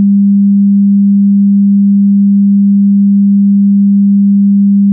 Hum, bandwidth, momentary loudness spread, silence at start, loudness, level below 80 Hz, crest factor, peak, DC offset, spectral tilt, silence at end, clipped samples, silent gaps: none; 0.3 kHz; 0 LU; 0 s; -7 LUFS; -66 dBFS; 4 dB; -4 dBFS; under 0.1%; -20.5 dB/octave; 0 s; under 0.1%; none